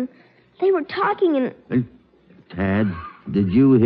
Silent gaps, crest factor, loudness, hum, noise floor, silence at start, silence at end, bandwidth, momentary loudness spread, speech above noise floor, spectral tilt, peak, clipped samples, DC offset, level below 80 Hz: none; 16 dB; -21 LUFS; none; -53 dBFS; 0 s; 0 s; 5.2 kHz; 14 LU; 34 dB; -11.5 dB/octave; -6 dBFS; under 0.1%; under 0.1%; -50 dBFS